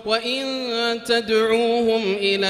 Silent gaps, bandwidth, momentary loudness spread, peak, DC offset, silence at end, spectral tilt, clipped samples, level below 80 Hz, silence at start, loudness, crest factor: none; 14.5 kHz; 5 LU; -6 dBFS; under 0.1%; 0 s; -3.5 dB/octave; under 0.1%; -60 dBFS; 0 s; -20 LUFS; 16 dB